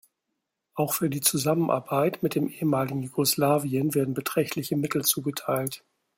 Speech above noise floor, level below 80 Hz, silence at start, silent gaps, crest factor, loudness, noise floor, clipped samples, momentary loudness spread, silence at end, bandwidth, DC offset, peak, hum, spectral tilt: 56 dB; -66 dBFS; 0.75 s; none; 18 dB; -26 LUFS; -82 dBFS; under 0.1%; 6 LU; 0.4 s; 16.5 kHz; under 0.1%; -8 dBFS; none; -4.5 dB/octave